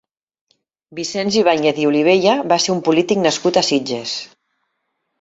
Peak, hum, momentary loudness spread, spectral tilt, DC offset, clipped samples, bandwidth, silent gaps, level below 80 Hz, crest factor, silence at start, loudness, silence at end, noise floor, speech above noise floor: -2 dBFS; none; 11 LU; -4 dB/octave; under 0.1%; under 0.1%; 8 kHz; none; -60 dBFS; 16 dB; 0.9 s; -16 LUFS; 0.95 s; -72 dBFS; 56 dB